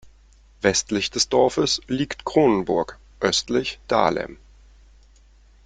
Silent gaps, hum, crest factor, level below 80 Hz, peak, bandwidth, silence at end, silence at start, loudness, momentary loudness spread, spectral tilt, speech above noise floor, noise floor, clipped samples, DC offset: none; none; 22 dB; -48 dBFS; -2 dBFS; 9.6 kHz; 1.3 s; 0.05 s; -22 LUFS; 7 LU; -3.5 dB/octave; 31 dB; -52 dBFS; under 0.1%; under 0.1%